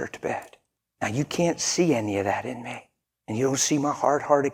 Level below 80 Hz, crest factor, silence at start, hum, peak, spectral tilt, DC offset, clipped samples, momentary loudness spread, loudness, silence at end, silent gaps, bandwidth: -64 dBFS; 20 dB; 0 s; none; -6 dBFS; -4 dB/octave; under 0.1%; under 0.1%; 12 LU; -25 LUFS; 0 s; none; 18 kHz